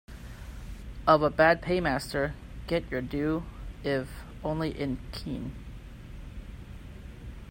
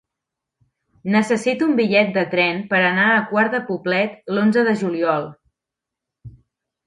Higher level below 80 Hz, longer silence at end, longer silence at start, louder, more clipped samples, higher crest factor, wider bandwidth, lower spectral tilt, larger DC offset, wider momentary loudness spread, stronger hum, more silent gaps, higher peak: first, -44 dBFS vs -62 dBFS; second, 0 s vs 0.55 s; second, 0.1 s vs 1.05 s; second, -29 LUFS vs -18 LUFS; neither; first, 24 dB vs 18 dB; first, 16 kHz vs 11.5 kHz; about the same, -6.5 dB/octave vs -6 dB/octave; neither; first, 22 LU vs 6 LU; neither; neither; second, -6 dBFS vs -2 dBFS